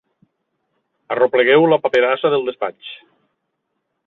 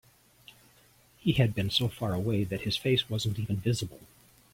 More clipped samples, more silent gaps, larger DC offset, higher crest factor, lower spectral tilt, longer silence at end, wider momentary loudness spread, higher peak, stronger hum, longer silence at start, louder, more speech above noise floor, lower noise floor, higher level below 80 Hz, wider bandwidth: neither; neither; neither; about the same, 16 dB vs 20 dB; about the same, -6.5 dB/octave vs -5.5 dB/octave; first, 1.1 s vs 0.5 s; first, 14 LU vs 5 LU; first, -2 dBFS vs -12 dBFS; neither; second, 1.1 s vs 1.25 s; first, -16 LUFS vs -29 LUFS; first, 58 dB vs 32 dB; first, -74 dBFS vs -61 dBFS; second, -66 dBFS vs -54 dBFS; second, 6.6 kHz vs 16.5 kHz